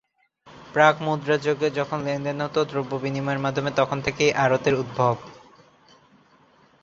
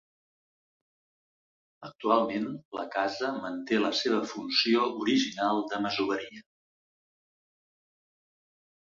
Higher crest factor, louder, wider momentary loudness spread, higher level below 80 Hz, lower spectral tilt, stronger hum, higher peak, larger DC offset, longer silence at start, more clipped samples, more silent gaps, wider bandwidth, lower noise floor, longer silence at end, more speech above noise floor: about the same, 22 dB vs 22 dB; first, -23 LUFS vs -29 LUFS; about the same, 8 LU vs 10 LU; first, -58 dBFS vs -74 dBFS; first, -5.5 dB/octave vs -4 dB/octave; neither; first, -2 dBFS vs -10 dBFS; neither; second, 0.45 s vs 1.8 s; neither; second, none vs 2.65-2.72 s; about the same, 7.6 kHz vs 7.6 kHz; second, -57 dBFS vs under -90 dBFS; second, 1.45 s vs 2.6 s; second, 34 dB vs over 61 dB